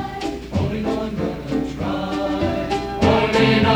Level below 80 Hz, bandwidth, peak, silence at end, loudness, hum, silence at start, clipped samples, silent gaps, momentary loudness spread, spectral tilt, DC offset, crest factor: -36 dBFS; 19.5 kHz; -4 dBFS; 0 s; -21 LUFS; none; 0 s; under 0.1%; none; 9 LU; -6.5 dB/octave; under 0.1%; 16 dB